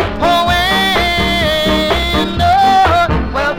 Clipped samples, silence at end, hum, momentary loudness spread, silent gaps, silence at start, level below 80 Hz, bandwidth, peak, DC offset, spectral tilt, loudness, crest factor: under 0.1%; 0 s; none; 4 LU; none; 0 s; -24 dBFS; 18 kHz; -2 dBFS; 0.4%; -4.5 dB/octave; -12 LUFS; 10 dB